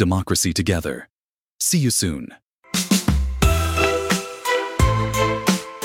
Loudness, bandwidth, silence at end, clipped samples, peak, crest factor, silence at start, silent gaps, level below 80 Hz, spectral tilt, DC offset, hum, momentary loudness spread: -20 LUFS; 17 kHz; 0 s; under 0.1%; -2 dBFS; 20 dB; 0 s; 1.10-1.59 s, 2.42-2.59 s; -28 dBFS; -4 dB/octave; under 0.1%; none; 7 LU